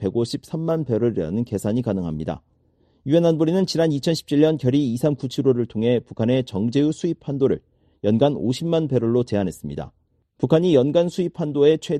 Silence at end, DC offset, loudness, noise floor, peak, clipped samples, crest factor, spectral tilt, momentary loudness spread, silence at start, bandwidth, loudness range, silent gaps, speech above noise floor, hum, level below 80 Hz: 0 s; under 0.1%; -21 LUFS; -61 dBFS; -4 dBFS; under 0.1%; 16 dB; -7.5 dB/octave; 9 LU; 0 s; 13 kHz; 2 LU; none; 41 dB; none; -52 dBFS